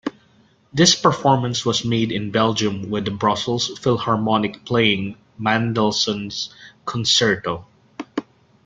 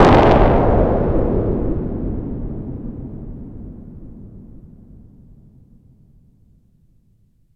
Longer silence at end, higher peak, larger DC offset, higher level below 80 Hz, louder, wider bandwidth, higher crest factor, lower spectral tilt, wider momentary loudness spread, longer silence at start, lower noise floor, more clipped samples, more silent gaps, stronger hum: second, 0.45 s vs 3 s; about the same, 0 dBFS vs 0 dBFS; neither; second, -56 dBFS vs -26 dBFS; about the same, -19 LUFS vs -18 LUFS; first, 9.4 kHz vs 8.4 kHz; about the same, 20 dB vs 18 dB; second, -4 dB/octave vs -8.5 dB/octave; second, 14 LU vs 26 LU; about the same, 0.05 s vs 0 s; about the same, -56 dBFS vs -57 dBFS; neither; neither; neither